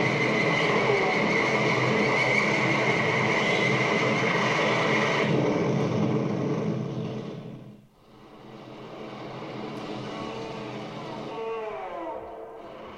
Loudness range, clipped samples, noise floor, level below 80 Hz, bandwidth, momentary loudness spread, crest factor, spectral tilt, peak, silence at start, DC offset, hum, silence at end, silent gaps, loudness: 15 LU; under 0.1%; -52 dBFS; -62 dBFS; 12 kHz; 17 LU; 16 dB; -5.5 dB/octave; -10 dBFS; 0 s; under 0.1%; none; 0 s; none; -25 LUFS